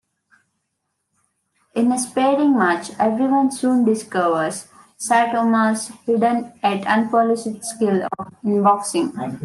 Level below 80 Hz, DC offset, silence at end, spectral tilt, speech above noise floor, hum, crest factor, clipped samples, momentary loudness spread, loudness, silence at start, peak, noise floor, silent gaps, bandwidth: -68 dBFS; under 0.1%; 0 s; -5 dB/octave; 56 dB; none; 16 dB; under 0.1%; 8 LU; -19 LUFS; 1.75 s; -4 dBFS; -75 dBFS; none; 12.5 kHz